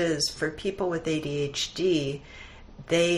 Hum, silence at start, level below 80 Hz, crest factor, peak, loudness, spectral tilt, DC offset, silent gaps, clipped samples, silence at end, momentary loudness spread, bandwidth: none; 0 s; -52 dBFS; 16 dB; -12 dBFS; -28 LUFS; -4 dB/octave; under 0.1%; none; under 0.1%; 0 s; 20 LU; 13.5 kHz